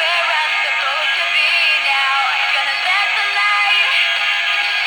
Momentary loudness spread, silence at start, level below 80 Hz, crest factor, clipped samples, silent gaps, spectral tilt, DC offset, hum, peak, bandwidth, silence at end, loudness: 3 LU; 0 s; -64 dBFS; 12 dB; under 0.1%; none; 2.5 dB/octave; under 0.1%; none; -4 dBFS; 18 kHz; 0 s; -14 LUFS